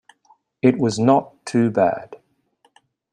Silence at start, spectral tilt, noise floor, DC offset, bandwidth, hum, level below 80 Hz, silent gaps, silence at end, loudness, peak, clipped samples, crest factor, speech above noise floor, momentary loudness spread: 0.65 s; -6.5 dB/octave; -63 dBFS; under 0.1%; 10.5 kHz; none; -62 dBFS; none; 0.95 s; -19 LUFS; -2 dBFS; under 0.1%; 18 dB; 45 dB; 5 LU